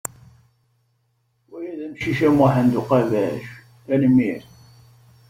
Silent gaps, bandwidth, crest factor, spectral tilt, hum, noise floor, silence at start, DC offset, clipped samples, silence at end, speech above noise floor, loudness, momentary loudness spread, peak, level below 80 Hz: none; 16 kHz; 18 dB; -7 dB/octave; none; -67 dBFS; 1.5 s; under 0.1%; under 0.1%; 0.9 s; 49 dB; -19 LUFS; 18 LU; -4 dBFS; -54 dBFS